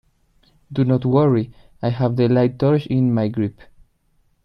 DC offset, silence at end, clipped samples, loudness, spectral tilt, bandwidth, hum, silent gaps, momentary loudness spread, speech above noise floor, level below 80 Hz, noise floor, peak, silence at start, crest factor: under 0.1%; 0.95 s; under 0.1%; -19 LUFS; -10.5 dB/octave; 5.6 kHz; none; none; 10 LU; 44 dB; -52 dBFS; -62 dBFS; -4 dBFS; 0.7 s; 16 dB